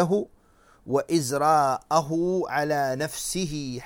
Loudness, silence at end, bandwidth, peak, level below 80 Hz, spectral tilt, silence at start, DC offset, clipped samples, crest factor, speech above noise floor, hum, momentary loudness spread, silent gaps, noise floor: -25 LUFS; 0 s; 17.5 kHz; -8 dBFS; -54 dBFS; -5 dB/octave; 0 s; under 0.1%; under 0.1%; 18 dB; 33 dB; none; 7 LU; none; -58 dBFS